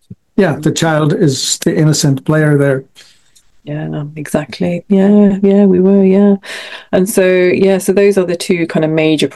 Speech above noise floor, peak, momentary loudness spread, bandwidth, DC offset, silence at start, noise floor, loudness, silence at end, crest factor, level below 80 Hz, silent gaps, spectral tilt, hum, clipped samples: 39 dB; 0 dBFS; 11 LU; 12.5 kHz; 0.3%; 0.1 s; -50 dBFS; -12 LUFS; 0 s; 12 dB; -50 dBFS; none; -5.5 dB/octave; none; under 0.1%